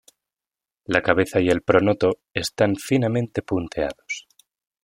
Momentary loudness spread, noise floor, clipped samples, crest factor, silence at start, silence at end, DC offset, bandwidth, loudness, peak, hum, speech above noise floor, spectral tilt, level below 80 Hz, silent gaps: 11 LU; under -90 dBFS; under 0.1%; 20 dB; 0.9 s; 0.65 s; under 0.1%; 16.5 kHz; -22 LUFS; -2 dBFS; none; over 69 dB; -5.5 dB/octave; -52 dBFS; none